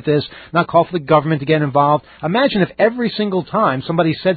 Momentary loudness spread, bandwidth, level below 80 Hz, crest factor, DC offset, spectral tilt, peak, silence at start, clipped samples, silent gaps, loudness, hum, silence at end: 5 LU; 4.8 kHz; -52 dBFS; 16 dB; under 0.1%; -12 dB/octave; 0 dBFS; 0.05 s; under 0.1%; none; -16 LUFS; none; 0 s